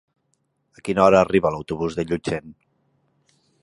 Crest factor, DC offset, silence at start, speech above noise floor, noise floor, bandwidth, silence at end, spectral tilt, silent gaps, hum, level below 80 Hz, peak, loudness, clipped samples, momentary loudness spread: 22 dB; under 0.1%; 0.85 s; 51 dB; -71 dBFS; 11.5 kHz; 1.1 s; -6.5 dB/octave; none; none; -50 dBFS; -2 dBFS; -21 LUFS; under 0.1%; 14 LU